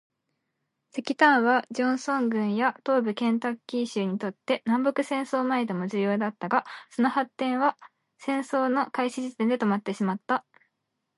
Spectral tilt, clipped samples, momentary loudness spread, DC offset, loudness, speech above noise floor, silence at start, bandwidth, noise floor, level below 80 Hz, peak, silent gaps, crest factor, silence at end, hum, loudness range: -5.5 dB/octave; under 0.1%; 7 LU; under 0.1%; -26 LUFS; 54 dB; 0.95 s; 11.5 kHz; -80 dBFS; -80 dBFS; -6 dBFS; none; 20 dB; 0.75 s; none; 3 LU